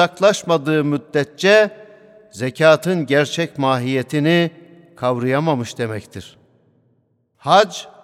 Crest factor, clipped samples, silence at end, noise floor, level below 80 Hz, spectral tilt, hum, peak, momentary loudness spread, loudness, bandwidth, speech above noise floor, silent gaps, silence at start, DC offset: 18 dB; under 0.1%; 0.15 s; -63 dBFS; -64 dBFS; -5.5 dB/octave; none; 0 dBFS; 12 LU; -17 LUFS; 15 kHz; 46 dB; none; 0 s; under 0.1%